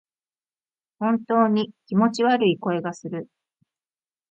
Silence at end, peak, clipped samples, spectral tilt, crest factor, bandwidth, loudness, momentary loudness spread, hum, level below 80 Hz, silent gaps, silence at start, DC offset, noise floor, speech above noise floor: 1.05 s; -8 dBFS; under 0.1%; -6.5 dB/octave; 16 dB; 8.2 kHz; -22 LUFS; 12 LU; none; -70 dBFS; none; 1 s; under 0.1%; under -90 dBFS; over 68 dB